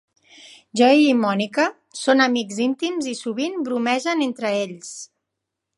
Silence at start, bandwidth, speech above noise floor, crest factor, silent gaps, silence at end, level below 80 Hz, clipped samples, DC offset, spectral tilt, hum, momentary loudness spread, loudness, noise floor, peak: 0.45 s; 11.5 kHz; 61 dB; 18 dB; none; 0.75 s; -76 dBFS; under 0.1%; under 0.1%; -4 dB/octave; none; 13 LU; -20 LUFS; -81 dBFS; -2 dBFS